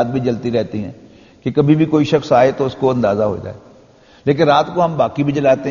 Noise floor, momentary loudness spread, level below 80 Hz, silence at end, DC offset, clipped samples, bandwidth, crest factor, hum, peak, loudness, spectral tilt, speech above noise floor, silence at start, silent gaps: -46 dBFS; 12 LU; -50 dBFS; 0 s; under 0.1%; under 0.1%; 7.2 kHz; 16 dB; none; 0 dBFS; -16 LUFS; -6 dB/octave; 31 dB; 0 s; none